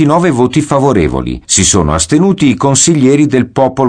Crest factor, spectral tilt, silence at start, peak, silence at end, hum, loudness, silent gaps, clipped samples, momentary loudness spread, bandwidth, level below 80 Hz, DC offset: 10 dB; -4.5 dB/octave; 0 s; 0 dBFS; 0 s; none; -9 LUFS; none; 0.1%; 4 LU; 10.5 kHz; -30 dBFS; under 0.1%